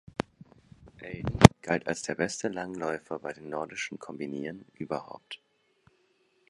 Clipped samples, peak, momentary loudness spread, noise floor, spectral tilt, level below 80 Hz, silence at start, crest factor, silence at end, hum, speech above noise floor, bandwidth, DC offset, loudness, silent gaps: under 0.1%; 0 dBFS; 24 LU; -69 dBFS; -5.5 dB/octave; -48 dBFS; 1 s; 30 dB; 1.15 s; none; 42 dB; 11.5 kHz; under 0.1%; -28 LUFS; none